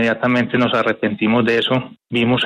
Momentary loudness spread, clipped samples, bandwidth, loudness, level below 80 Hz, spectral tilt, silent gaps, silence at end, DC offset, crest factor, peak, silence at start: 4 LU; under 0.1%; 9.2 kHz; -17 LUFS; -56 dBFS; -6.5 dB/octave; none; 0 s; under 0.1%; 12 dB; -4 dBFS; 0 s